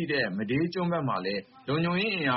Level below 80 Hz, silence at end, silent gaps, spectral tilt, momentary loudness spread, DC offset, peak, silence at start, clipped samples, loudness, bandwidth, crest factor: -62 dBFS; 0 s; none; -4 dB/octave; 6 LU; under 0.1%; -12 dBFS; 0 s; under 0.1%; -29 LUFS; 5.8 kHz; 16 dB